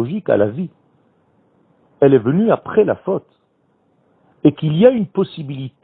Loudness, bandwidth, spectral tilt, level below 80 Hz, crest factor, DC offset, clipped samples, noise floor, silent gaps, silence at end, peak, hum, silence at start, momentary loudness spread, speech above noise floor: -16 LUFS; 4.4 kHz; -11.5 dB/octave; -56 dBFS; 18 dB; under 0.1%; under 0.1%; -61 dBFS; none; 0.15 s; 0 dBFS; none; 0 s; 13 LU; 46 dB